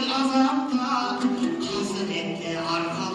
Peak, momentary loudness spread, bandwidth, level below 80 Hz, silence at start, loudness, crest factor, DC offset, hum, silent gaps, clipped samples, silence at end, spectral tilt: -8 dBFS; 7 LU; 11 kHz; -62 dBFS; 0 s; -25 LUFS; 16 dB; under 0.1%; none; none; under 0.1%; 0 s; -4.5 dB/octave